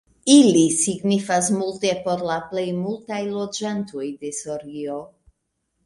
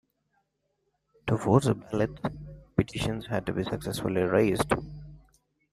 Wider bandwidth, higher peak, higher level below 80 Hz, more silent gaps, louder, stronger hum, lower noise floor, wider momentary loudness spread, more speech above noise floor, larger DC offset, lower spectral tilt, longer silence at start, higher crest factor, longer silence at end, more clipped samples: second, 11.5 kHz vs 15 kHz; first, -2 dBFS vs -6 dBFS; second, -62 dBFS vs -50 dBFS; neither; first, -21 LUFS vs -28 LUFS; second, none vs 50 Hz at -45 dBFS; about the same, -75 dBFS vs -77 dBFS; first, 16 LU vs 12 LU; first, 54 dB vs 50 dB; neither; second, -4 dB/octave vs -6.5 dB/octave; second, 0.25 s vs 1.25 s; about the same, 20 dB vs 24 dB; first, 0.8 s vs 0.55 s; neither